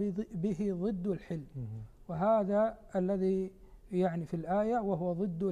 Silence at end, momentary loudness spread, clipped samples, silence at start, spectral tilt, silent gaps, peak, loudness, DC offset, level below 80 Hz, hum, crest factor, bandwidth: 0 s; 13 LU; under 0.1%; 0 s; -9.5 dB/octave; none; -18 dBFS; -33 LUFS; under 0.1%; -58 dBFS; none; 14 dB; 9.8 kHz